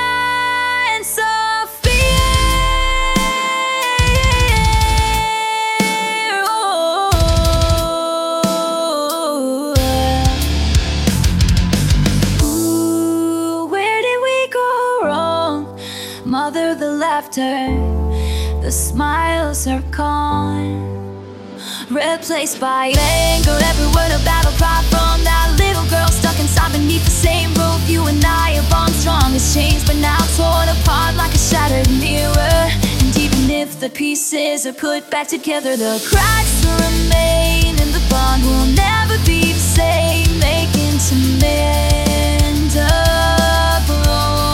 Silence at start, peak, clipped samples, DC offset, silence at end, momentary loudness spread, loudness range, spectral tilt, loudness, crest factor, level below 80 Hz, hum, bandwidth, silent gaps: 0 s; 0 dBFS; under 0.1%; under 0.1%; 0 s; 6 LU; 4 LU; -4.5 dB/octave; -15 LUFS; 14 dB; -20 dBFS; none; 17 kHz; none